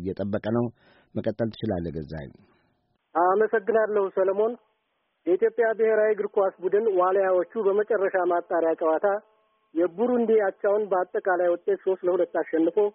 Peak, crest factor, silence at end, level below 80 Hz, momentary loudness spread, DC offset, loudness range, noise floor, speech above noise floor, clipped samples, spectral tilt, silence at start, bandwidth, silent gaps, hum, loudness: -10 dBFS; 14 dB; 0.05 s; -60 dBFS; 10 LU; under 0.1%; 3 LU; -74 dBFS; 50 dB; under 0.1%; -6 dB/octave; 0 s; 5.4 kHz; none; none; -25 LUFS